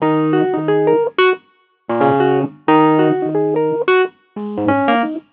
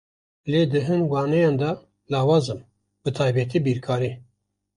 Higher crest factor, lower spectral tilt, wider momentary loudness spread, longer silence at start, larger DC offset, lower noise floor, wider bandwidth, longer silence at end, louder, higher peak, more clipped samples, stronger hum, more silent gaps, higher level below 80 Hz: about the same, 16 dB vs 16 dB; first, -10.5 dB/octave vs -7.5 dB/octave; second, 9 LU vs 12 LU; second, 0 s vs 0.45 s; neither; second, -55 dBFS vs -70 dBFS; second, 4.7 kHz vs 11 kHz; second, 0.1 s vs 0.55 s; first, -15 LUFS vs -23 LUFS; first, 0 dBFS vs -8 dBFS; neither; neither; neither; second, -66 dBFS vs -58 dBFS